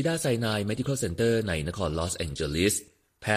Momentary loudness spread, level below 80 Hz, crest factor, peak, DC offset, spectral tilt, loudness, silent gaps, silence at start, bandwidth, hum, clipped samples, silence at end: 5 LU; -46 dBFS; 18 dB; -10 dBFS; under 0.1%; -4.5 dB/octave; -28 LUFS; none; 0 s; 15 kHz; none; under 0.1%; 0 s